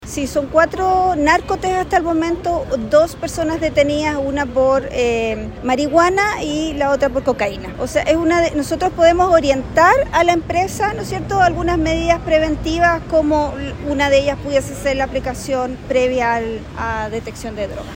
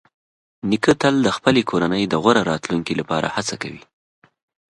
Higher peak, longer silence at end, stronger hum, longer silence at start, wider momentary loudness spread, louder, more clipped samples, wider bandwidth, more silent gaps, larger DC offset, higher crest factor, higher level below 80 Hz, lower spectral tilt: about the same, 0 dBFS vs 0 dBFS; second, 0 s vs 0.9 s; neither; second, 0 s vs 0.65 s; about the same, 9 LU vs 9 LU; about the same, -17 LUFS vs -19 LUFS; neither; first, 16.5 kHz vs 11.5 kHz; neither; neither; about the same, 16 dB vs 20 dB; first, -34 dBFS vs -54 dBFS; about the same, -5 dB/octave vs -5 dB/octave